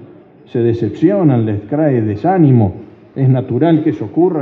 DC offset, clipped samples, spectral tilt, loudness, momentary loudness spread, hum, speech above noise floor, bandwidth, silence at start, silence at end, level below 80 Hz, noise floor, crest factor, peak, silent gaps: under 0.1%; under 0.1%; -11 dB/octave; -14 LUFS; 7 LU; none; 27 dB; 4.4 kHz; 0 s; 0 s; -56 dBFS; -39 dBFS; 14 dB; 0 dBFS; none